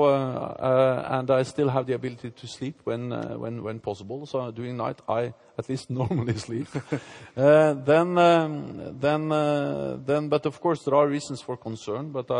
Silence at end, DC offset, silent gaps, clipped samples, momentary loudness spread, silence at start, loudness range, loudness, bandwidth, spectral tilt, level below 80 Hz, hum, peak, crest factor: 0 s; under 0.1%; none; under 0.1%; 15 LU; 0 s; 9 LU; -25 LUFS; 10.5 kHz; -7 dB/octave; -64 dBFS; none; -6 dBFS; 18 dB